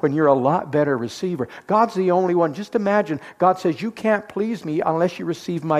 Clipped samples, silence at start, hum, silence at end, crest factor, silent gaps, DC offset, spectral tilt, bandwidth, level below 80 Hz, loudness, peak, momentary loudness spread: under 0.1%; 0.05 s; none; 0 s; 16 dB; none; under 0.1%; -7 dB/octave; 14 kHz; -64 dBFS; -21 LUFS; -4 dBFS; 8 LU